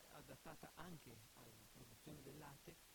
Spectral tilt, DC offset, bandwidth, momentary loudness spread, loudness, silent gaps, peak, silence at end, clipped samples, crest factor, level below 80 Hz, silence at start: -4 dB/octave; under 0.1%; 19.5 kHz; 5 LU; -60 LUFS; none; -40 dBFS; 0 s; under 0.1%; 22 dB; -76 dBFS; 0 s